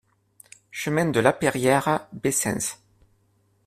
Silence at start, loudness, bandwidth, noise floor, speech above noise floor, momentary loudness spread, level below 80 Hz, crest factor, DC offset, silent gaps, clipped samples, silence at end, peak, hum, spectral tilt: 0.75 s; -23 LUFS; 16 kHz; -65 dBFS; 42 dB; 11 LU; -58 dBFS; 22 dB; under 0.1%; none; under 0.1%; 0.9 s; -2 dBFS; none; -4.5 dB/octave